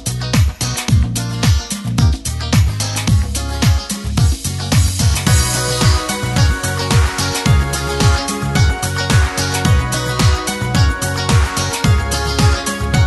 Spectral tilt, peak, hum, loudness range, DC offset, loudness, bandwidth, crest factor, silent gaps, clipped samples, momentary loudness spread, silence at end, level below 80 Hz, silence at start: -4.5 dB/octave; 0 dBFS; none; 1 LU; under 0.1%; -15 LUFS; 12.5 kHz; 14 dB; none; under 0.1%; 4 LU; 0 s; -20 dBFS; 0 s